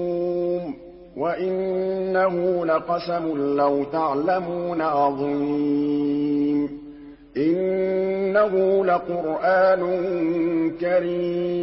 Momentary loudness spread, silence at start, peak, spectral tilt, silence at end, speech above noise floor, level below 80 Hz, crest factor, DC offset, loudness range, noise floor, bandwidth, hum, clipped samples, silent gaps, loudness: 7 LU; 0 s; -8 dBFS; -11.5 dB/octave; 0 s; 20 dB; -56 dBFS; 14 dB; under 0.1%; 3 LU; -42 dBFS; 5.8 kHz; none; under 0.1%; none; -22 LUFS